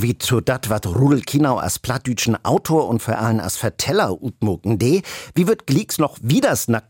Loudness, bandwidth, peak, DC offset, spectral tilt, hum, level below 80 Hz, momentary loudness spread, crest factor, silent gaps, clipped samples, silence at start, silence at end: -19 LUFS; 17 kHz; -6 dBFS; under 0.1%; -5.5 dB/octave; none; -50 dBFS; 6 LU; 14 dB; none; under 0.1%; 0 s; 0.1 s